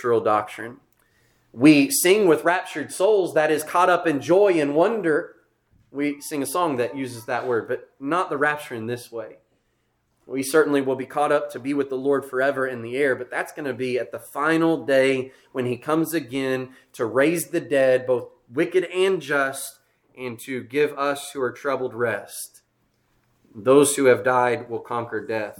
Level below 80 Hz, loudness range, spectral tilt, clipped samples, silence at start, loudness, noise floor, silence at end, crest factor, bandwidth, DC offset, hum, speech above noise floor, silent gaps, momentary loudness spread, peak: -70 dBFS; 7 LU; -4.5 dB/octave; under 0.1%; 0 s; -22 LUFS; -70 dBFS; 0.05 s; 20 dB; 19 kHz; under 0.1%; none; 48 dB; none; 14 LU; -2 dBFS